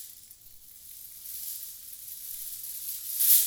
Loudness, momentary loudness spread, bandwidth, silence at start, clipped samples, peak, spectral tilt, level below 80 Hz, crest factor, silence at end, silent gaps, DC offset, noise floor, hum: -31 LUFS; 19 LU; over 20 kHz; 0 s; under 0.1%; -8 dBFS; 3.5 dB/octave; -70 dBFS; 24 dB; 0 s; none; under 0.1%; -51 dBFS; none